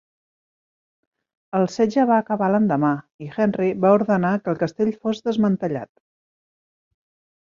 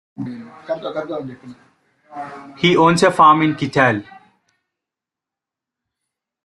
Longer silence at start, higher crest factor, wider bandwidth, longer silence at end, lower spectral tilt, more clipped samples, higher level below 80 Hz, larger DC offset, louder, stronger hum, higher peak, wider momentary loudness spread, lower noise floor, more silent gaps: first, 1.55 s vs 0.2 s; about the same, 20 dB vs 18 dB; second, 7.4 kHz vs 12 kHz; second, 1.65 s vs 2.4 s; first, -8 dB/octave vs -5.5 dB/octave; neither; second, -64 dBFS vs -58 dBFS; neither; second, -21 LUFS vs -16 LUFS; neither; second, -4 dBFS vs 0 dBFS; second, 10 LU vs 22 LU; first, under -90 dBFS vs -86 dBFS; first, 3.14-3.19 s vs none